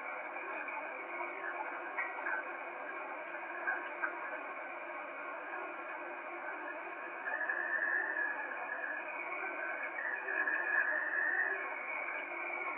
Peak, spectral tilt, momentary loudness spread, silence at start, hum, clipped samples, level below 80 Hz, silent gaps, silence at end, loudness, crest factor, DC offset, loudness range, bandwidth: -22 dBFS; 0.5 dB/octave; 10 LU; 0 s; none; under 0.1%; under -90 dBFS; none; 0 s; -38 LUFS; 18 dB; under 0.1%; 6 LU; 4 kHz